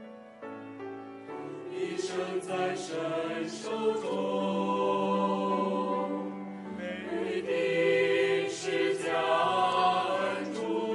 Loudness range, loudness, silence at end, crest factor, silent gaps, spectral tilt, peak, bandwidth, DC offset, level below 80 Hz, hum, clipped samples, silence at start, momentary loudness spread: 7 LU; -30 LUFS; 0 s; 16 dB; none; -5 dB/octave; -14 dBFS; 11.5 kHz; under 0.1%; -76 dBFS; none; under 0.1%; 0 s; 16 LU